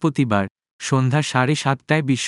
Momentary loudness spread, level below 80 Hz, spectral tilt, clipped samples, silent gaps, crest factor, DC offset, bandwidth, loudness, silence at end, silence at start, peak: 6 LU; -64 dBFS; -5.5 dB/octave; under 0.1%; 0.50-0.55 s, 0.71-0.79 s; 18 dB; under 0.1%; 11.5 kHz; -20 LUFS; 0 s; 0 s; -2 dBFS